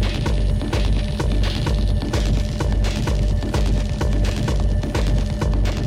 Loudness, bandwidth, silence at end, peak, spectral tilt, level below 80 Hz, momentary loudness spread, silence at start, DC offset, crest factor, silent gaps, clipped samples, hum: -22 LUFS; 11.5 kHz; 0 s; -8 dBFS; -6 dB/octave; -20 dBFS; 1 LU; 0 s; under 0.1%; 12 dB; none; under 0.1%; none